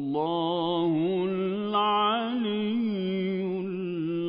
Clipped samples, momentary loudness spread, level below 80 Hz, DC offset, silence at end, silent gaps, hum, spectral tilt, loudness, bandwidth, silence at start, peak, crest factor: under 0.1%; 6 LU; -74 dBFS; under 0.1%; 0 s; none; none; -10.5 dB/octave; -27 LUFS; 5.2 kHz; 0 s; -14 dBFS; 14 dB